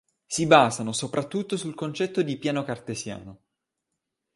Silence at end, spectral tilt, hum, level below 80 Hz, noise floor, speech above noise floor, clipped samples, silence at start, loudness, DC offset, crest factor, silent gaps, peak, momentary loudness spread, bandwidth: 1 s; -4.5 dB/octave; none; -64 dBFS; -83 dBFS; 58 dB; under 0.1%; 0.3 s; -25 LUFS; under 0.1%; 24 dB; none; -2 dBFS; 15 LU; 11.5 kHz